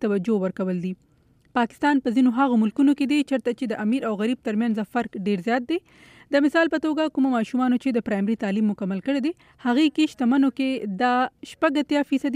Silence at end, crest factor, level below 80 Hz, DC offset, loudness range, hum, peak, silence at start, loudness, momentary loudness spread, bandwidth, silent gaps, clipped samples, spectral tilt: 0 s; 14 dB; -64 dBFS; under 0.1%; 2 LU; none; -8 dBFS; 0 s; -23 LUFS; 7 LU; 11 kHz; none; under 0.1%; -6.5 dB/octave